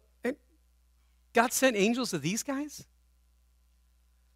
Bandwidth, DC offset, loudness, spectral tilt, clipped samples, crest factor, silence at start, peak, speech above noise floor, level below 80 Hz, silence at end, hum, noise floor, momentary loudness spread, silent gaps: 16 kHz; under 0.1%; -29 LUFS; -3.5 dB/octave; under 0.1%; 26 dB; 0.25 s; -8 dBFS; 37 dB; -66 dBFS; 1.55 s; none; -66 dBFS; 16 LU; none